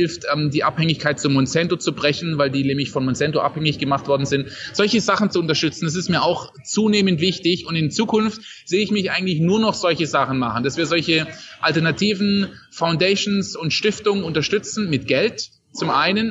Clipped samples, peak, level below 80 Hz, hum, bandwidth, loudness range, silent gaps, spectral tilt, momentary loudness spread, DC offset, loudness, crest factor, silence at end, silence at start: under 0.1%; -4 dBFS; -54 dBFS; none; 8.2 kHz; 1 LU; none; -5 dB/octave; 5 LU; under 0.1%; -20 LUFS; 16 dB; 0 s; 0 s